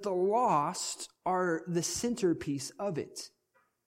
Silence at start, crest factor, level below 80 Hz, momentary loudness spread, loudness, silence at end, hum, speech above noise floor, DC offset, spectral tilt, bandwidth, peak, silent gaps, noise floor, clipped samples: 0 s; 16 dB; -68 dBFS; 11 LU; -32 LUFS; 0.6 s; none; 42 dB; under 0.1%; -4.5 dB/octave; 16.5 kHz; -16 dBFS; none; -73 dBFS; under 0.1%